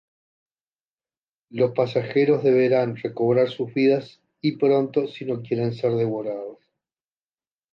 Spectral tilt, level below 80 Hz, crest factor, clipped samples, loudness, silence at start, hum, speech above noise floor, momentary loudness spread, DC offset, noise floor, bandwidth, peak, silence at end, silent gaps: -9 dB/octave; -70 dBFS; 16 dB; under 0.1%; -22 LUFS; 1.55 s; none; over 68 dB; 10 LU; under 0.1%; under -90 dBFS; 6.2 kHz; -8 dBFS; 1.2 s; none